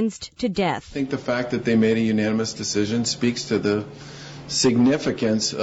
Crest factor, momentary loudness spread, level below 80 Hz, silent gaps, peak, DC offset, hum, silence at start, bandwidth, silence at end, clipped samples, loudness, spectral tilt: 14 dB; 8 LU; -52 dBFS; none; -8 dBFS; under 0.1%; none; 0 s; 8 kHz; 0 s; under 0.1%; -22 LUFS; -4.5 dB/octave